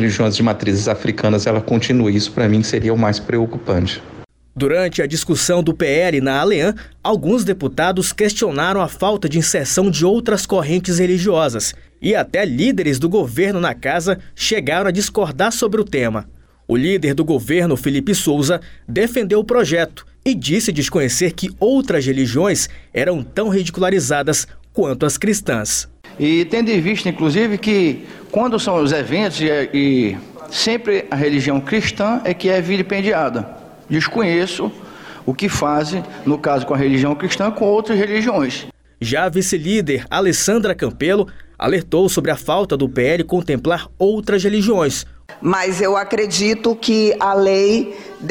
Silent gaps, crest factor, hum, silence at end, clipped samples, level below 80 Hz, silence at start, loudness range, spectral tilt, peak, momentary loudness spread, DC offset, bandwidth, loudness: none; 12 dB; none; 0 s; under 0.1%; -44 dBFS; 0 s; 2 LU; -4.5 dB/octave; -4 dBFS; 6 LU; under 0.1%; 18 kHz; -17 LUFS